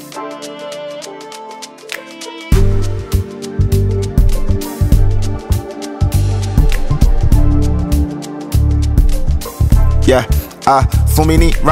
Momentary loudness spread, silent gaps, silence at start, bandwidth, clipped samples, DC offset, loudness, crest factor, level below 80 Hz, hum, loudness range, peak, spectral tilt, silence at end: 14 LU; none; 0 s; 16.5 kHz; under 0.1%; under 0.1%; -15 LUFS; 12 dB; -14 dBFS; none; 5 LU; 0 dBFS; -6.5 dB/octave; 0 s